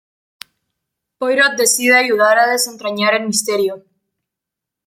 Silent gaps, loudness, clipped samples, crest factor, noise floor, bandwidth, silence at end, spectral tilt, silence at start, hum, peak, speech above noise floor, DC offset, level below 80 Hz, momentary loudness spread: none; -14 LUFS; under 0.1%; 16 dB; -83 dBFS; 16.5 kHz; 1.1 s; -1.5 dB/octave; 1.2 s; none; -2 dBFS; 69 dB; under 0.1%; -70 dBFS; 9 LU